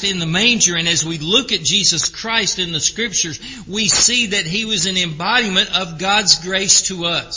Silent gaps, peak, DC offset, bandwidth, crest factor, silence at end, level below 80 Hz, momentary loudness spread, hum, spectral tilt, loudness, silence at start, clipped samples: none; 0 dBFS; under 0.1%; 7.8 kHz; 18 dB; 0 s; -46 dBFS; 6 LU; none; -1.5 dB/octave; -14 LUFS; 0 s; under 0.1%